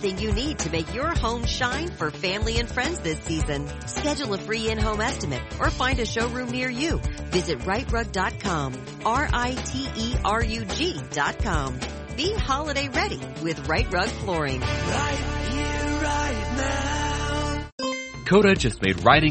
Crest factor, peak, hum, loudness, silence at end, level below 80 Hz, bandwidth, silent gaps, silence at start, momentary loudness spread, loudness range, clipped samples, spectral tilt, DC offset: 24 dB; 0 dBFS; none; -25 LUFS; 0 s; -34 dBFS; 8.8 kHz; 17.72-17.78 s; 0 s; 6 LU; 2 LU; under 0.1%; -4.5 dB/octave; under 0.1%